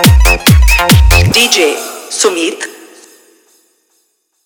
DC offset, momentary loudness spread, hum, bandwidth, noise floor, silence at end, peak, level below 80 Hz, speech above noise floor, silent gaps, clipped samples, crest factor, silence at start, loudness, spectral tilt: under 0.1%; 13 LU; none; over 20 kHz; -60 dBFS; 1.7 s; 0 dBFS; -14 dBFS; 48 dB; none; 0.2%; 10 dB; 0 s; -8 LUFS; -4 dB/octave